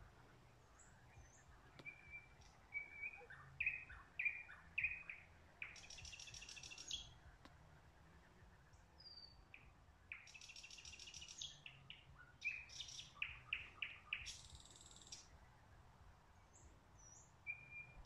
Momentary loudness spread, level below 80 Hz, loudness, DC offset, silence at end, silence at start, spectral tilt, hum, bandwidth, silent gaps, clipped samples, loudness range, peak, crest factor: 24 LU; -70 dBFS; -50 LUFS; under 0.1%; 0 s; 0 s; -1 dB/octave; none; 13 kHz; none; under 0.1%; 12 LU; -30 dBFS; 24 dB